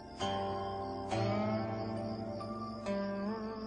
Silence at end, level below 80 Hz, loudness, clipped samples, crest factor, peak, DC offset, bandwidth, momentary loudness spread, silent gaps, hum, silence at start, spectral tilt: 0 s; -60 dBFS; -38 LUFS; under 0.1%; 16 dB; -22 dBFS; under 0.1%; 10 kHz; 7 LU; none; none; 0 s; -6.5 dB/octave